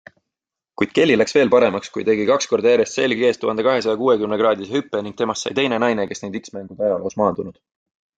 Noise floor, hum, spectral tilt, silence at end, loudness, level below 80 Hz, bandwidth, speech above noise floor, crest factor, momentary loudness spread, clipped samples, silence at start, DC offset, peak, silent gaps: -85 dBFS; none; -4.5 dB/octave; 0.65 s; -19 LUFS; -60 dBFS; 9.2 kHz; 66 dB; 16 dB; 11 LU; under 0.1%; 0.8 s; under 0.1%; -2 dBFS; none